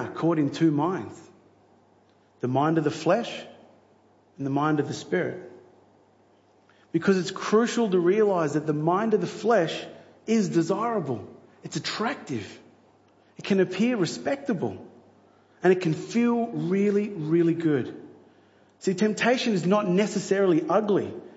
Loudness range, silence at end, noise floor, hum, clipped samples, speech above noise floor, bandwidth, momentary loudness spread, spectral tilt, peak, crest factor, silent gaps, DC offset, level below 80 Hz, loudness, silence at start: 5 LU; 0 s; -60 dBFS; none; under 0.1%; 36 dB; 8 kHz; 13 LU; -6 dB/octave; -8 dBFS; 18 dB; none; under 0.1%; -74 dBFS; -25 LUFS; 0 s